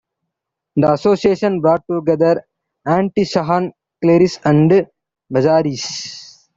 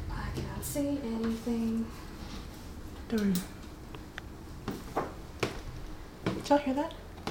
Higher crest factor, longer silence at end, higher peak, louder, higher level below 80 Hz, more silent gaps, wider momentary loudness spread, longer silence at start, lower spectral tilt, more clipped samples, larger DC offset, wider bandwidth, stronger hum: second, 14 dB vs 22 dB; first, 0.35 s vs 0 s; first, -2 dBFS vs -12 dBFS; first, -16 LUFS vs -35 LUFS; second, -54 dBFS vs -46 dBFS; neither; second, 12 LU vs 16 LU; first, 0.75 s vs 0 s; about the same, -6.5 dB/octave vs -5.5 dB/octave; neither; neither; second, 7.8 kHz vs 18 kHz; neither